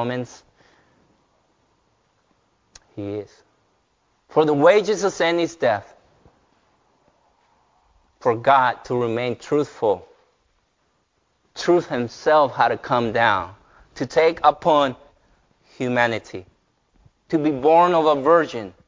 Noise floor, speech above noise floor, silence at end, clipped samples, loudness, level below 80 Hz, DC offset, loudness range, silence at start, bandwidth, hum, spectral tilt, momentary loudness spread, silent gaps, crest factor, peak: -68 dBFS; 48 dB; 0.15 s; under 0.1%; -20 LUFS; -58 dBFS; under 0.1%; 8 LU; 0 s; 7.6 kHz; none; -5.5 dB/octave; 15 LU; none; 20 dB; -2 dBFS